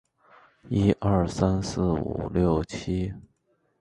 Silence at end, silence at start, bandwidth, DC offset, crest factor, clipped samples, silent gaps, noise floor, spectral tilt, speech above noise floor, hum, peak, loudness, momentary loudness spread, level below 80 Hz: 0.6 s; 0.65 s; 11 kHz; under 0.1%; 20 dB; under 0.1%; none; -70 dBFS; -7.5 dB/octave; 45 dB; none; -8 dBFS; -26 LUFS; 7 LU; -40 dBFS